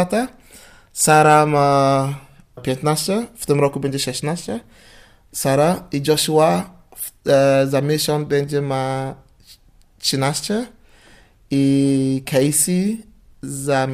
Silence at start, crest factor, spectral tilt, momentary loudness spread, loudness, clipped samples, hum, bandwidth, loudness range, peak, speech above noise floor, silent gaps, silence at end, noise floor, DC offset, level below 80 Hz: 0 s; 16 dB; -4.5 dB/octave; 16 LU; -18 LUFS; under 0.1%; none; 15.5 kHz; 5 LU; -2 dBFS; 33 dB; none; 0 s; -50 dBFS; under 0.1%; -52 dBFS